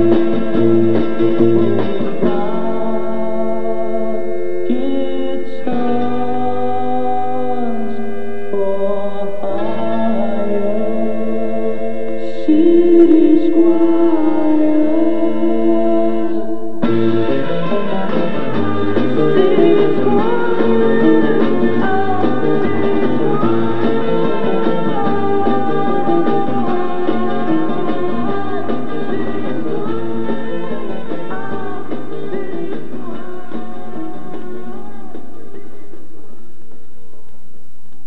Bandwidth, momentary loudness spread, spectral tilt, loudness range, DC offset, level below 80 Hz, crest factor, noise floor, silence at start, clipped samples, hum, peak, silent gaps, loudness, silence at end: 5.6 kHz; 13 LU; -9 dB/octave; 13 LU; 20%; -54 dBFS; 16 dB; -49 dBFS; 0 s; under 0.1%; none; 0 dBFS; none; -17 LUFS; 1.9 s